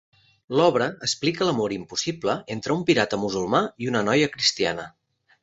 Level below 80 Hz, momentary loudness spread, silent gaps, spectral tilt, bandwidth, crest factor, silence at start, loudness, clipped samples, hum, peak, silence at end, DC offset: -60 dBFS; 7 LU; none; -4 dB/octave; 8 kHz; 20 dB; 0.5 s; -23 LUFS; under 0.1%; none; -4 dBFS; 0.55 s; under 0.1%